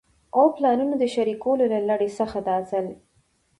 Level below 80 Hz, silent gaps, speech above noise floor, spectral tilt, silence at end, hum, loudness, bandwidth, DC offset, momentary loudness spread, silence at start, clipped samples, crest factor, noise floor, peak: -60 dBFS; none; 43 dB; -6.5 dB/octave; 0.65 s; none; -23 LUFS; 11.5 kHz; under 0.1%; 8 LU; 0.35 s; under 0.1%; 16 dB; -65 dBFS; -6 dBFS